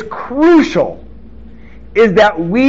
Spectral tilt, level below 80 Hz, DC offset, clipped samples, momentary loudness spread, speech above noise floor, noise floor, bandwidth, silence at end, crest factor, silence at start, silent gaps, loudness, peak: -4.5 dB/octave; -38 dBFS; 2%; under 0.1%; 11 LU; 25 dB; -36 dBFS; 7.6 kHz; 0 s; 12 dB; 0 s; none; -11 LUFS; 0 dBFS